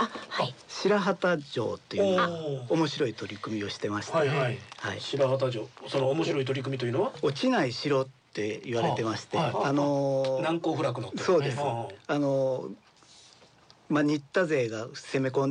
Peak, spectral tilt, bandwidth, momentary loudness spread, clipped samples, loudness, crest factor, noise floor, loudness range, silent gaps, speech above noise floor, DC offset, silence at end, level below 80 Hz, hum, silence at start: -14 dBFS; -6 dB/octave; 10 kHz; 8 LU; under 0.1%; -29 LUFS; 14 dB; -58 dBFS; 2 LU; none; 30 dB; under 0.1%; 0 s; -72 dBFS; none; 0 s